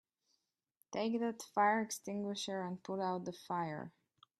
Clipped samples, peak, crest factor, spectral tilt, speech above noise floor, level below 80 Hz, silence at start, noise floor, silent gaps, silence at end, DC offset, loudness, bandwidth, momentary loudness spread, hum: under 0.1%; -20 dBFS; 20 dB; -4.5 dB/octave; 46 dB; -84 dBFS; 0.9 s; -84 dBFS; none; 0.5 s; under 0.1%; -38 LUFS; 13.5 kHz; 11 LU; none